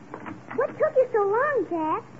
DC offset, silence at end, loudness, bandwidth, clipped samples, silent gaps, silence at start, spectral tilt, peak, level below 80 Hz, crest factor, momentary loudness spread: 0.2%; 0 s; -24 LUFS; 7.6 kHz; under 0.1%; none; 0 s; -7.5 dB/octave; -12 dBFS; -68 dBFS; 14 dB; 13 LU